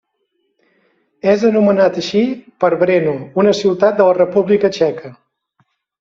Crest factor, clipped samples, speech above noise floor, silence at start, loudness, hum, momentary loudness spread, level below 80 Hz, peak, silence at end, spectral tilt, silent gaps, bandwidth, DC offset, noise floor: 14 dB; under 0.1%; 54 dB; 1.25 s; -14 LUFS; none; 6 LU; -58 dBFS; -2 dBFS; 0.9 s; -6.5 dB/octave; none; 7.6 kHz; under 0.1%; -67 dBFS